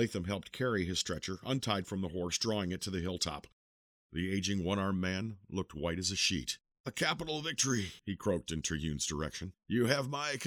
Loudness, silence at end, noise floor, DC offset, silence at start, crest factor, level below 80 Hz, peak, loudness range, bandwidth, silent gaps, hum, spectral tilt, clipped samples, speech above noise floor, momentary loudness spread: -35 LUFS; 0 s; under -90 dBFS; under 0.1%; 0 s; 22 dB; -56 dBFS; -14 dBFS; 2 LU; 17.5 kHz; 3.53-4.10 s, 6.80-6.84 s; none; -4 dB/octave; under 0.1%; over 55 dB; 9 LU